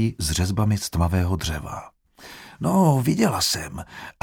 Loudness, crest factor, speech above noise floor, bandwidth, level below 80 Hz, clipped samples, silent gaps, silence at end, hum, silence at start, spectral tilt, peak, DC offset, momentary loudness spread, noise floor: -22 LUFS; 18 dB; 23 dB; 18.5 kHz; -38 dBFS; under 0.1%; none; 0.1 s; none; 0 s; -5 dB/octave; -4 dBFS; under 0.1%; 19 LU; -45 dBFS